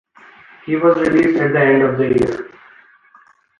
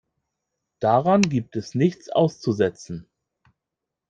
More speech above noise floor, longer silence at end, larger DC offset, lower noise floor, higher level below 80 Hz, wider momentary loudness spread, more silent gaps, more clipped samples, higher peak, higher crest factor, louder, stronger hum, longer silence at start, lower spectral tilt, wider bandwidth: second, 36 dB vs 63 dB; about the same, 1.15 s vs 1.1 s; neither; second, -51 dBFS vs -85 dBFS; first, -50 dBFS vs -60 dBFS; about the same, 15 LU vs 15 LU; neither; neither; about the same, -2 dBFS vs -2 dBFS; second, 14 dB vs 22 dB; first, -15 LUFS vs -22 LUFS; neither; second, 0.65 s vs 0.8 s; first, -8 dB/octave vs -6.5 dB/octave; first, 10.5 kHz vs 9 kHz